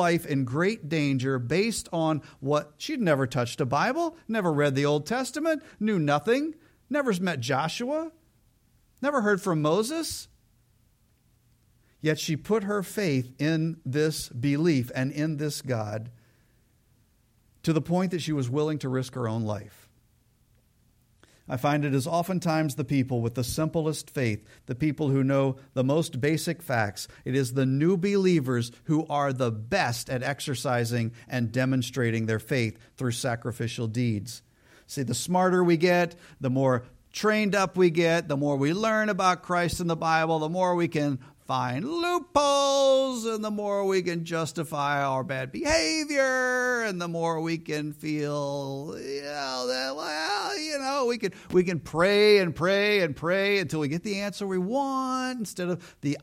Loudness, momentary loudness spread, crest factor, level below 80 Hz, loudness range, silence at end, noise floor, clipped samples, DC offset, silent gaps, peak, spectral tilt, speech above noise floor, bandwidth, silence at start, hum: -27 LUFS; 8 LU; 18 dB; -58 dBFS; 6 LU; 0 s; -65 dBFS; under 0.1%; under 0.1%; none; -8 dBFS; -5.5 dB/octave; 39 dB; 16.5 kHz; 0 s; none